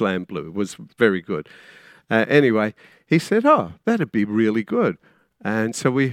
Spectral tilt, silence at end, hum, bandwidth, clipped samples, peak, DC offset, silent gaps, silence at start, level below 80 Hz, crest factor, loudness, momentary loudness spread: -6 dB/octave; 0 s; none; 14.5 kHz; under 0.1%; -2 dBFS; under 0.1%; none; 0 s; -64 dBFS; 20 dB; -21 LUFS; 13 LU